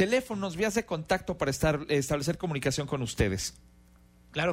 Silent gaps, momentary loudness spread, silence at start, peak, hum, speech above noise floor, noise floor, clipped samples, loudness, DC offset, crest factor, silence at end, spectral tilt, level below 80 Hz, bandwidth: none; 6 LU; 0 s; -12 dBFS; none; 29 dB; -58 dBFS; under 0.1%; -30 LUFS; under 0.1%; 18 dB; 0 s; -5 dB/octave; -48 dBFS; 16 kHz